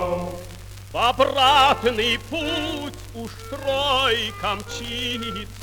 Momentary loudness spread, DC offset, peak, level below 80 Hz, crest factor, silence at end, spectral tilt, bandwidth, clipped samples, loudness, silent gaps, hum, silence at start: 19 LU; under 0.1%; -6 dBFS; -42 dBFS; 18 dB; 0 s; -3.5 dB/octave; over 20 kHz; under 0.1%; -21 LUFS; none; none; 0 s